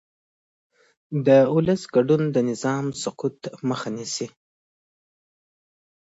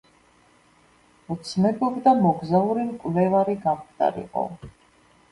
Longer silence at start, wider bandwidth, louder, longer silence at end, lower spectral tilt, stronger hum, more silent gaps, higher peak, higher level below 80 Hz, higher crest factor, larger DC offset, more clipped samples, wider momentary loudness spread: second, 1.1 s vs 1.3 s; second, 8 kHz vs 11.5 kHz; about the same, -22 LUFS vs -23 LUFS; first, 1.85 s vs 0.6 s; second, -6 dB/octave vs -8 dB/octave; neither; neither; about the same, -4 dBFS vs -6 dBFS; about the same, -64 dBFS vs -60 dBFS; about the same, 20 dB vs 18 dB; neither; neither; about the same, 13 LU vs 12 LU